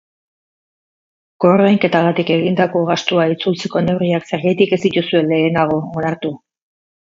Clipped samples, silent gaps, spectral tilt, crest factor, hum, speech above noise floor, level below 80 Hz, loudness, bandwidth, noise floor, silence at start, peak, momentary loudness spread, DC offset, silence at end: under 0.1%; none; -6.5 dB/octave; 16 dB; none; over 75 dB; -56 dBFS; -16 LUFS; 7.6 kHz; under -90 dBFS; 1.4 s; 0 dBFS; 8 LU; under 0.1%; 0.8 s